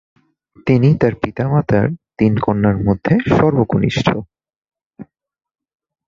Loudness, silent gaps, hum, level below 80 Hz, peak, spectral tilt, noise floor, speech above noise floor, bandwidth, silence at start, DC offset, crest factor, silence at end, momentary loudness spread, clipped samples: -16 LUFS; 4.58-4.62 s, 4.86-4.91 s; none; -40 dBFS; -2 dBFS; -8 dB/octave; -40 dBFS; 25 dB; 7.4 kHz; 0.65 s; under 0.1%; 16 dB; 1.05 s; 6 LU; under 0.1%